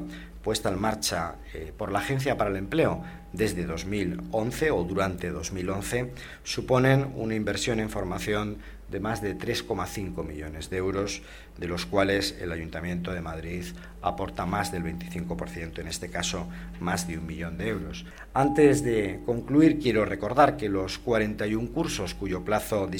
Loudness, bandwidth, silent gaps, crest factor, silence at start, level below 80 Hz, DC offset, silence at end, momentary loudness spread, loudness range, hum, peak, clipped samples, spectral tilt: -28 LUFS; 16.5 kHz; none; 22 dB; 0 s; -44 dBFS; under 0.1%; 0 s; 14 LU; 8 LU; none; -6 dBFS; under 0.1%; -5 dB/octave